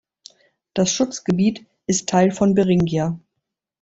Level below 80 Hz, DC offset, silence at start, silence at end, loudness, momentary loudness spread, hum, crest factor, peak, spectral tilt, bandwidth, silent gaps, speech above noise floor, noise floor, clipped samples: -52 dBFS; under 0.1%; 0.75 s; 0.65 s; -20 LUFS; 11 LU; none; 16 dB; -4 dBFS; -5.5 dB/octave; 8 kHz; none; 61 dB; -80 dBFS; under 0.1%